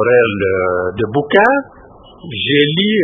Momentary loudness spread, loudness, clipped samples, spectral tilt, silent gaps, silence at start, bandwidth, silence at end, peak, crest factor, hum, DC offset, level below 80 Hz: 7 LU; -14 LUFS; under 0.1%; -8 dB/octave; none; 0 s; 3.8 kHz; 0 s; 0 dBFS; 14 dB; none; under 0.1%; -44 dBFS